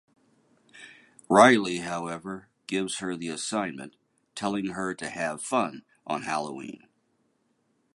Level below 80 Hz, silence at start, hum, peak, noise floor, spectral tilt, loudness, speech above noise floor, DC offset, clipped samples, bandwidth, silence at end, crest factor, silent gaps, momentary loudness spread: -68 dBFS; 0.75 s; none; -4 dBFS; -72 dBFS; -4 dB/octave; -27 LUFS; 45 dB; under 0.1%; under 0.1%; 11.5 kHz; 1.15 s; 26 dB; none; 24 LU